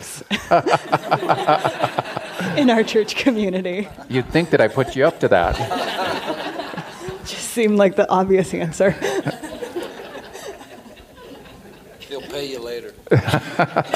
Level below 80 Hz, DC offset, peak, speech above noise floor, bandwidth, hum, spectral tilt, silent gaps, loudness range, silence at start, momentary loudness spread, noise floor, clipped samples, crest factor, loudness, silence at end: -44 dBFS; under 0.1%; -2 dBFS; 24 dB; 15.5 kHz; none; -5.5 dB/octave; none; 12 LU; 0 s; 17 LU; -42 dBFS; under 0.1%; 18 dB; -20 LUFS; 0 s